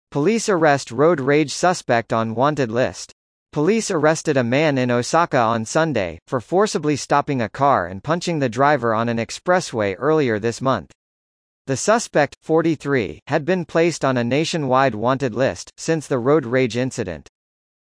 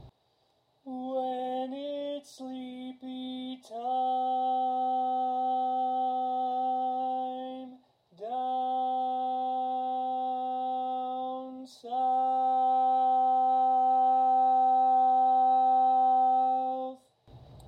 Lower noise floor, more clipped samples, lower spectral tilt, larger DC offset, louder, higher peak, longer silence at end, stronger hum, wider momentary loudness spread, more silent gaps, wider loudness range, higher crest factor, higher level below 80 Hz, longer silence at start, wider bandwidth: first, under -90 dBFS vs -71 dBFS; neither; about the same, -5 dB/octave vs -5.5 dB/octave; neither; first, -19 LUFS vs -28 LUFS; first, -2 dBFS vs -18 dBFS; first, 0.75 s vs 0 s; neither; second, 6 LU vs 16 LU; first, 3.12-3.46 s, 6.22-6.26 s, 10.95-11.65 s, 12.37-12.41 s, 13.22-13.26 s vs none; second, 2 LU vs 10 LU; first, 16 dB vs 10 dB; first, -56 dBFS vs -74 dBFS; about the same, 0.1 s vs 0.05 s; first, 10.5 kHz vs 6.4 kHz